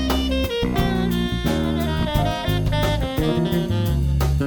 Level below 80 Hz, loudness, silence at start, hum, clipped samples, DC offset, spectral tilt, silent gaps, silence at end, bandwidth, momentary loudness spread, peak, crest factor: -28 dBFS; -22 LUFS; 0 s; none; under 0.1%; under 0.1%; -6.5 dB/octave; none; 0 s; over 20 kHz; 1 LU; -6 dBFS; 14 dB